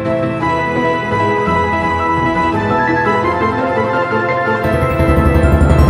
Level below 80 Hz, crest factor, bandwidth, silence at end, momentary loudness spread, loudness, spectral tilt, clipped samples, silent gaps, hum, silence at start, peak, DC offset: -22 dBFS; 14 dB; 13.5 kHz; 0 s; 4 LU; -14 LUFS; -7.5 dB/octave; under 0.1%; none; none; 0 s; 0 dBFS; under 0.1%